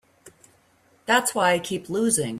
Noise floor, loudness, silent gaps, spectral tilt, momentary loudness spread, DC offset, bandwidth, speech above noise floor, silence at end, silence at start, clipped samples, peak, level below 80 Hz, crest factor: -61 dBFS; -22 LUFS; none; -3 dB/octave; 7 LU; under 0.1%; 15.5 kHz; 38 dB; 0 s; 0.25 s; under 0.1%; -6 dBFS; -64 dBFS; 18 dB